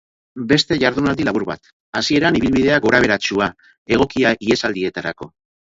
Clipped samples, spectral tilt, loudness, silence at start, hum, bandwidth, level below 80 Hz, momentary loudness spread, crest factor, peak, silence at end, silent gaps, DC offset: under 0.1%; -5 dB/octave; -17 LUFS; 0.35 s; none; 7.8 kHz; -44 dBFS; 13 LU; 18 dB; 0 dBFS; 0.5 s; 1.73-1.93 s, 3.78-3.86 s; under 0.1%